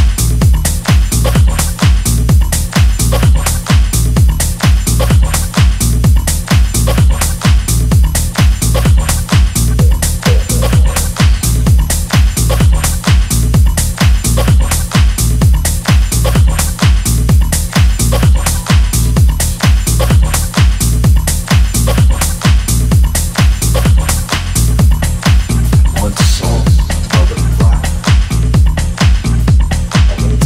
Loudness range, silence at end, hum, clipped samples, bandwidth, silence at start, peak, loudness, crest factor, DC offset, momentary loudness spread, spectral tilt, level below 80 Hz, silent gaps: 1 LU; 0 s; none; under 0.1%; 16.5 kHz; 0 s; 0 dBFS; -11 LUFS; 10 dB; under 0.1%; 2 LU; -4.5 dB/octave; -12 dBFS; none